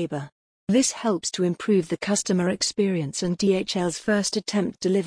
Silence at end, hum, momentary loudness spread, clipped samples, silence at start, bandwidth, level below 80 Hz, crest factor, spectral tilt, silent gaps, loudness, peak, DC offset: 0 s; none; 5 LU; under 0.1%; 0 s; 10.5 kHz; -60 dBFS; 14 dB; -4.5 dB/octave; 0.32-0.67 s; -24 LUFS; -10 dBFS; under 0.1%